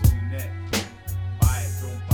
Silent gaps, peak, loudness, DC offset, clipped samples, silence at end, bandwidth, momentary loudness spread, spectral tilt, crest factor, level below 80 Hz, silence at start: none; -8 dBFS; -26 LUFS; under 0.1%; under 0.1%; 0 s; 19.5 kHz; 9 LU; -5 dB/octave; 16 dB; -30 dBFS; 0 s